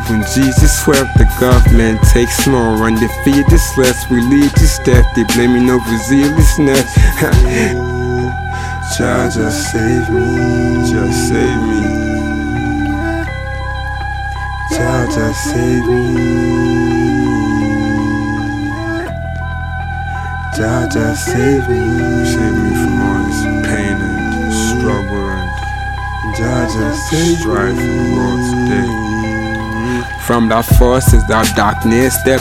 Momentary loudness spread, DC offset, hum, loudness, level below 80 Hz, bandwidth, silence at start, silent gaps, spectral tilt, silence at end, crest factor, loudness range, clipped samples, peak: 10 LU; under 0.1%; none; -13 LUFS; -18 dBFS; 17 kHz; 0 s; none; -5.5 dB/octave; 0 s; 12 dB; 6 LU; 0.6%; 0 dBFS